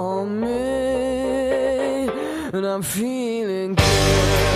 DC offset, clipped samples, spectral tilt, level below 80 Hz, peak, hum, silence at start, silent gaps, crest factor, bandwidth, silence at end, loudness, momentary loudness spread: under 0.1%; under 0.1%; -4.5 dB/octave; -32 dBFS; -2 dBFS; none; 0 s; none; 18 dB; 15.5 kHz; 0 s; -21 LUFS; 8 LU